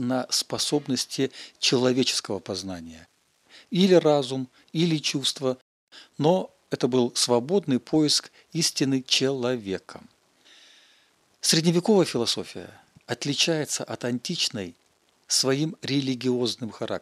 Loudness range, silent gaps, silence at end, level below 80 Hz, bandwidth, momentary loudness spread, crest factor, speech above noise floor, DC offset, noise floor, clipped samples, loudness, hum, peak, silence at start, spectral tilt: 3 LU; 5.61-5.87 s; 0 s; -70 dBFS; 14.5 kHz; 12 LU; 20 dB; 38 dB; under 0.1%; -63 dBFS; under 0.1%; -24 LUFS; none; -6 dBFS; 0 s; -4 dB/octave